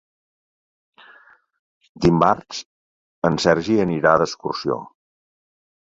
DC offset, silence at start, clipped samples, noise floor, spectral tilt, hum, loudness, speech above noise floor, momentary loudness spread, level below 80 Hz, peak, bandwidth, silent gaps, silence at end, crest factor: under 0.1%; 2 s; under 0.1%; -51 dBFS; -6 dB/octave; none; -19 LUFS; 33 dB; 10 LU; -48 dBFS; -2 dBFS; 7.8 kHz; 2.65-3.22 s; 1.1 s; 20 dB